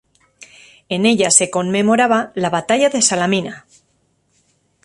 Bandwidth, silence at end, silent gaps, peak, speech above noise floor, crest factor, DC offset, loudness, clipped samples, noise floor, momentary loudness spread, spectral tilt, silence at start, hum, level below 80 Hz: 11.5 kHz; 1.25 s; none; 0 dBFS; 47 dB; 18 dB; under 0.1%; -15 LUFS; under 0.1%; -63 dBFS; 8 LU; -3 dB/octave; 0.4 s; none; -60 dBFS